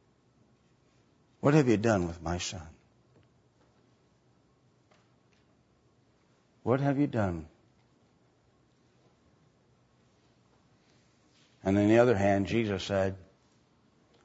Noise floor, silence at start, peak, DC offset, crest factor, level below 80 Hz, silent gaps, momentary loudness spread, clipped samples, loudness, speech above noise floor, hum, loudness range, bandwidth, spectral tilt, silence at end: -67 dBFS; 1.45 s; -10 dBFS; under 0.1%; 24 dB; -60 dBFS; none; 15 LU; under 0.1%; -28 LUFS; 40 dB; none; 12 LU; 8 kHz; -6.5 dB/octave; 1 s